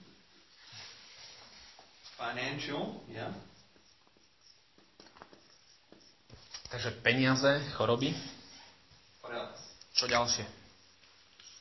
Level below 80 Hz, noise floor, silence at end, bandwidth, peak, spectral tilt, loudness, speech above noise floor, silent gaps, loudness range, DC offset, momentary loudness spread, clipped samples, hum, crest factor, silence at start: -66 dBFS; -66 dBFS; 0 s; 6.2 kHz; -10 dBFS; -4 dB/octave; -33 LUFS; 34 dB; none; 14 LU; under 0.1%; 25 LU; under 0.1%; none; 26 dB; 0 s